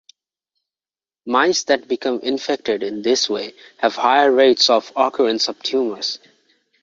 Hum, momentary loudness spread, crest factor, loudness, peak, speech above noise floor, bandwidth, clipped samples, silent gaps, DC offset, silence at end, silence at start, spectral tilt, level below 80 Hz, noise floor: none; 11 LU; 18 dB; -18 LUFS; 0 dBFS; over 72 dB; 7.6 kHz; under 0.1%; none; under 0.1%; 0.65 s; 1.25 s; -2 dB/octave; -66 dBFS; under -90 dBFS